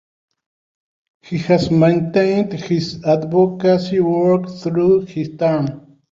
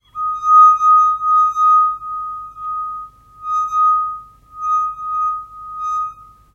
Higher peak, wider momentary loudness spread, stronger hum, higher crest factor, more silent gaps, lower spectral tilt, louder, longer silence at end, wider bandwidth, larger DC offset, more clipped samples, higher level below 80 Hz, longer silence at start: about the same, -2 dBFS vs -2 dBFS; second, 7 LU vs 18 LU; neither; about the same, 16 dB vs 14 dB; neither; first, -8 dB/octave vs -2 dB/octave; about the same, -17 LUFS vs -15 LUFS; about the same, 0.3 s vs 0.3 s; first, 7.6 kHz vs 6.6 kHz; neither; neither; about the same, -52 dBFS vs -54 dBFS; first, 1.25 s vs 0.15 s